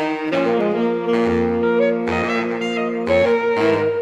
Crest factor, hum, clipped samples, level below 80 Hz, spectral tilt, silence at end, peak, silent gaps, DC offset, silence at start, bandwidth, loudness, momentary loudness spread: 12 dB; none; under 0.1%; -50 dBFS; -6.5 dB/octave; 0 s; -6 dBFS; none; under 0.1%; 0 s; 8.4 kHz; -19 LUFS; 4 LU